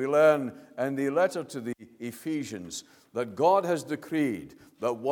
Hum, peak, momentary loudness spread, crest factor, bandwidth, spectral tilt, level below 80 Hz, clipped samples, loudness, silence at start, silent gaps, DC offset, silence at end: none; -10 dBFS; 16 LU; 18 dB; 18 kHz; -5.5 dB/octave; -72 dBFS; under 0.1%; -29 LUFS; 0 s; none; under 0.1%; 0 s